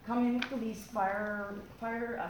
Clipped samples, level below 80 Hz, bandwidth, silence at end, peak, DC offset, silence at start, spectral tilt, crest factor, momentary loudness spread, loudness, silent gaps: under 0.1%; -62 dBFS; 20 kHz; 0 s; -16 dBFS; under 0.1%; 0 s; -5.5 dB/octave; 18 dB; 8 LU; -35 LUFS; none